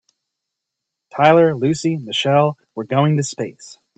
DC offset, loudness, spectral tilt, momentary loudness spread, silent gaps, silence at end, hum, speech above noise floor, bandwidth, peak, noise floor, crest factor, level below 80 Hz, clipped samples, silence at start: under 0.1%; -17 LUFS; -5.5 dB/octave; 16 LU; none; 0.25 s; none; 64 dB; 9 kHz; 0 dBFS; -81 dBFS; 18 dB; -60 dBFS; under 0.1%; 1.15 s